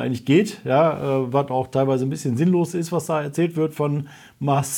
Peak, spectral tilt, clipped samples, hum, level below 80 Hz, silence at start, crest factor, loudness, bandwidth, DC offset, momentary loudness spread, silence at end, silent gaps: -6 dBFS; -6.5 dB/octave; under 0.1%; none; -64 dBFS; 0 s; 16 dB; -21 LUFS; 18 kHz; under 0.1%; 6 LU; 0 s; none